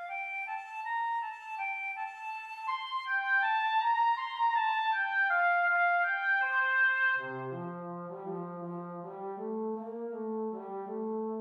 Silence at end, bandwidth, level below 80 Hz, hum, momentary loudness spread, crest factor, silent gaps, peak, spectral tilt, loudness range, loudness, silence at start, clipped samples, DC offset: 0 s; 8.4 kHz; -90 dBFS; none; 13 LU; 12 dB; none; -20 dBFS; -5.5 dB/octave; 11 LU; -31 LUFS; 0 s; under 0.1%; under 0.1%